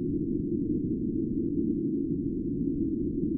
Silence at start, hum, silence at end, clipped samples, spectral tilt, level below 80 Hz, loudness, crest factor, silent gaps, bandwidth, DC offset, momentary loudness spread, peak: 0 s; none; 0 s; under 0.1%; -15.5 dB/octave; -46 dBFS; -30 LUFS; 12 dB; none; 0.7 kHz; under 0.1%; 2 LU; -16 dBFS